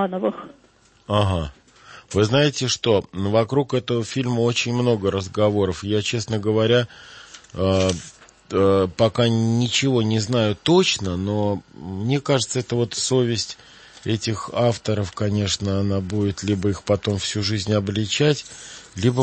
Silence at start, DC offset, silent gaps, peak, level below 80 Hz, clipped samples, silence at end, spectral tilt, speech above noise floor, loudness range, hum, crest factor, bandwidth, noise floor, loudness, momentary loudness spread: 0 s; under 0.1%; none; -4 dBFS; -50 dBFS; under 0.1%; 0 s; -5 dB/octave; 25 dB; 3 LU; none; 18 dB; 8.8 kHz; -46 dBFS; -21 LUFS; 9 LU